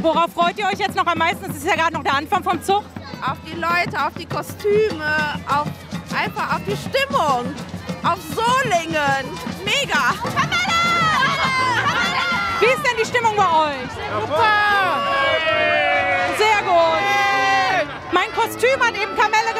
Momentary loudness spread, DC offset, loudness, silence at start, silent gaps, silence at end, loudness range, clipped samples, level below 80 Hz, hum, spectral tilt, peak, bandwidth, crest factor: 9 LU; under 0.1%; -18 LUFS; 0 s; none; 0 s; 5 LU; under 0.1%; -50 dBFS; none; -3.5 dB/octave; -4 dBFS; 16 kHz; 16 dB